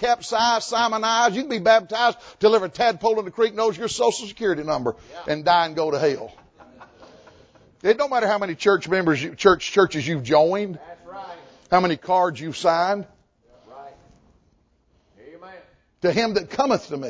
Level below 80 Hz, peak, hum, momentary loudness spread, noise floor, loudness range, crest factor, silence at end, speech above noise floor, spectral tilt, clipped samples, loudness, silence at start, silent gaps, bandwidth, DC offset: -56 dBFS; -2 dBFS; none; 9 LU; -63 dBFS; 7 LU; 20 dB; 0 s; 42 dB; -4 dB/octave; under 0.1%; -21 LUFS; 0 s; none; 8 kHz; under 0.1%